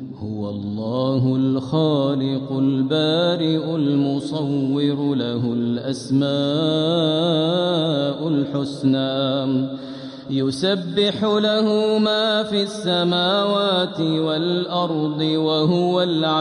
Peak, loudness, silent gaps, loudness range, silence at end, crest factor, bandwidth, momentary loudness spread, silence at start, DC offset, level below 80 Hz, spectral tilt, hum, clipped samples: -6 dBFS; -20 LUFS; none; 2 LU; 0 s; 12 dB; 11 kHz; 6 LU; 0 s; under 0.1%; -62 dBFS; -6.5 dB/octave; none; under 0.1%